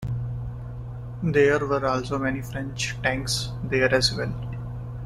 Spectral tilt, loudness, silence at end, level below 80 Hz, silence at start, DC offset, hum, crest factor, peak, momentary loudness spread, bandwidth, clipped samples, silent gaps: -4.5 dB/octave; -25 LUFS; 0 s; -42 dBFS; 0 s; under 0.1%; 60 Hz at -35 dBFS; 18 dB; -6 dBFS; 15 LU; 14 kHz; under 0.1%; none